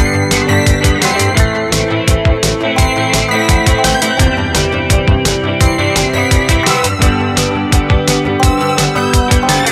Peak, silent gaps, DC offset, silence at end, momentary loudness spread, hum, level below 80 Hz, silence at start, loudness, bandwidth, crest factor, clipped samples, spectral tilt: 0 dBFS; none; under 0.1%; 0 s; 3 LU; none; -18 dBFS; 0 s; -12 LUFS; 15.5 kHz; 12 dB; under 0.1%; -4.5 dB/octave